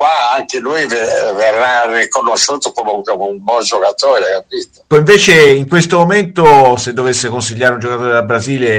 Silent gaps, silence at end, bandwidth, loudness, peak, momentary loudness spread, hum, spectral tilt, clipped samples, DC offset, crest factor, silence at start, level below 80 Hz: none; 0 s; 15.5 kHz; -11 LUFS; 0 dBFS; 10 LU; none; -4 dB/octave; 0.7%; under 0.1%; 10 dB; 0 s; -48 dBFS